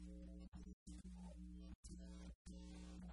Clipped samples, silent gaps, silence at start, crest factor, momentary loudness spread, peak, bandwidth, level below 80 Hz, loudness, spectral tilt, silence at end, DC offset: under 0.1%; 0.48-0.52 s, 0.73-0.86 s, 1.75-1.83 s, 2.35-2.45 s; 0 s; 12 dB; 2 LU; -44 dBFS; 11 kHz; -60 dBFS; -58 LUFS; -6 dB/octave; 0 s; under 0.1%